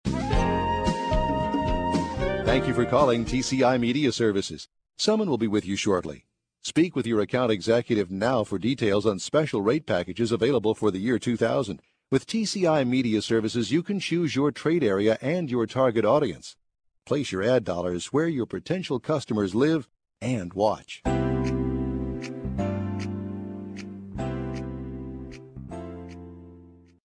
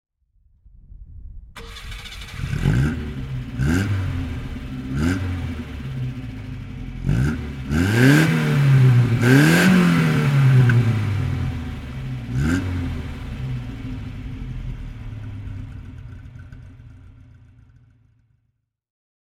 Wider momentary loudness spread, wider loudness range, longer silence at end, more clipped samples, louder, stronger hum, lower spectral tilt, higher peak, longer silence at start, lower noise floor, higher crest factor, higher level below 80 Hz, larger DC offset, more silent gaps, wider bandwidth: second, 14 LU vs 20 LU; second, 7 LU vs 19 LU; second, 0.35 s vs 2.25 s; neither; second, -26 LUFS vs -20 LUFS; neither; about the same, -6 dB/octave vs -6.5 dB/octave; second, -6 dBFS vs -2 dBFS; second, 0.05 s vs 0.9 s; second, -51 dBFS vs -72 dBFS; about the same, 18 dB vs 20 dB; second, -42 dBFS vs -34 dBFS; neither; neither; second, 10.5 kHz vs 15.5 kHz